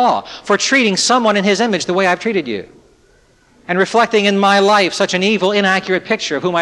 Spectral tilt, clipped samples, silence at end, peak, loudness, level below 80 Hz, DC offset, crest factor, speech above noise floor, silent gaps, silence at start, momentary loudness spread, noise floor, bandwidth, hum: -3.5 dB/octave; under 0.1%; 0 s; -2 dBFS; -14 LUFS; -58 dBFS; under 0.1%; 14 dB; 37 dB; none; 0 s; 7 LU; -52 dBFS; 12 kHz; none